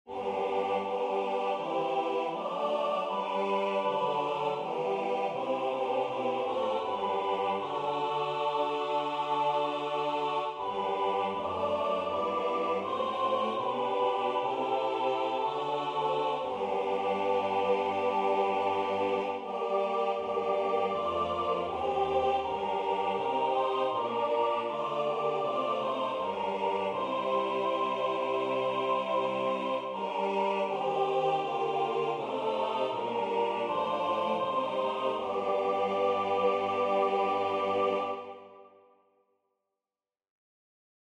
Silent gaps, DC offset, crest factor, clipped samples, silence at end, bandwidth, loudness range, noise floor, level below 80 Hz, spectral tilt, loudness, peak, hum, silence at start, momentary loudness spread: none; under 0.1%; 14 dB; under 0.1%; 2.45 s; 10 kHz; 2 LU; under -90 dBFS; -70 dBFS; -5.5 dB/octave; -30 LUFS; -16 dBFS; none; 0.05 s; 3 LU